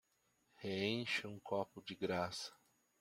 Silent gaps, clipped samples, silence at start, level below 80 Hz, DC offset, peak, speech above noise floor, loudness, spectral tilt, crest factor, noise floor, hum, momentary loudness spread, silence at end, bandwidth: none; under 0.1%; 0.6 s; -80 dBFS; under 0.1%; -22 dBFS; 37 dB; -42 LUFS; -4.5 dB/octave; 20 dB; -79 dBFS; none; 9 LU; 0.45 s; 16 kHz